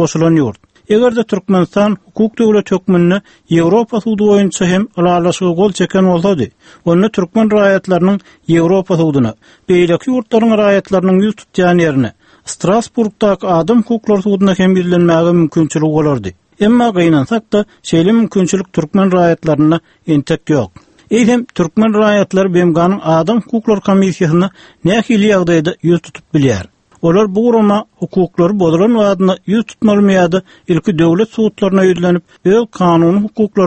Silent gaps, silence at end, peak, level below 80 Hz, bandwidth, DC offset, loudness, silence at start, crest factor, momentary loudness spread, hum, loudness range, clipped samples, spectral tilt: none; 0 s; 0 dBFS; -46 dBFS; 8.8 kHz; under 0.1%; -12 LUFS; 0 s; 12 dB; 6 LU; none; 1 LU; under 0.1%; -7 dB/octave